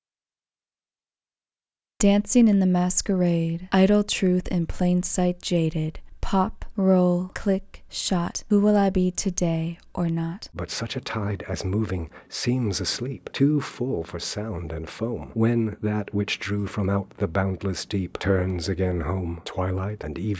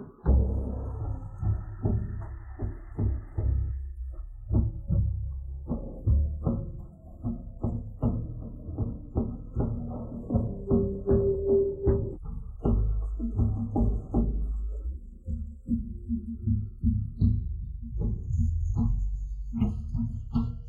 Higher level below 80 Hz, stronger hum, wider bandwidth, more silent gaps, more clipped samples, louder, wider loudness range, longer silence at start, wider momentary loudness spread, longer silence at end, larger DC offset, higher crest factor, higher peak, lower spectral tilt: second, -40 dBFS vs -32 dBFS; neither; first, 8 kHz vs 2.9 kHz; neither; neither; first, -25 LUFS vs -31 LUFS; about the same, 6 LU vs 5 LU; first, 2 s vs 0 s; about the same, 10 LU vs 12 LU; about the same, 0 s vs 0 s; neither; about the same, 18 dB vs 16 dB; first, -6 dBFS vs -12 dBFS; second, -5.5 dB/octave vs -12 dB/octave